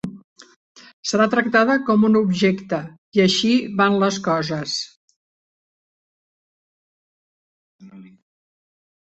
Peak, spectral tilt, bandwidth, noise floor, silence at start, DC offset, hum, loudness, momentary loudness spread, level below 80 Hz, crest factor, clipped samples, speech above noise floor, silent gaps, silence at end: -2 dBFS; -5 dB/octave; 8.2 kHz; under -90 dBFS; 0.05 s; under 0.1%; none; -19 LUFS; 11 LU; -62 dBFS; 20 dB; under 0.1%; over 71 dB; 0.24-0.36 s, 0.56-0.75 s, 0.93-1.03 s, 2.98-3.12 s, 4.97-5.08 s, 5.16-7.79 s; 1 s